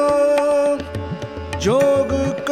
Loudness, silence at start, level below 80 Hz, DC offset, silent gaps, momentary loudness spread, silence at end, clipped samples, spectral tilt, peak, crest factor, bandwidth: -18 LUFS; 0 s; -40 dBFS; 0.1%; none; 12 LU; 0 s; under 0.1%; -5.5 dB/octave; -4 dBFS; 14 dB; 14.5 kHz